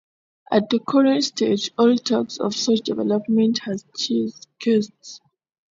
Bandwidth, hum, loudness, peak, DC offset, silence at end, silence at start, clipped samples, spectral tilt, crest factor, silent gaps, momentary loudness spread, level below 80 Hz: 7.8 kHz; none; -21 LUFS; -4 dBFS; under 0.1%; 0.6 s; 0.5 s; under 0.1%; -4.5 dB/octave; 18 dB; none; 10 LU; -68 dBFS